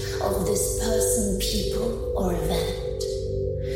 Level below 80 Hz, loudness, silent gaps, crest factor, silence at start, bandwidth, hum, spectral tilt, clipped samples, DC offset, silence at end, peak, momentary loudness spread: -32 dBFS; -25 LUFS; none; 14 dB; 0 s; 16.5 kHz; none; -4.5 dB/octave; under 0.1%; under 0.1%; 0 s; -12 dBFS; 6 LU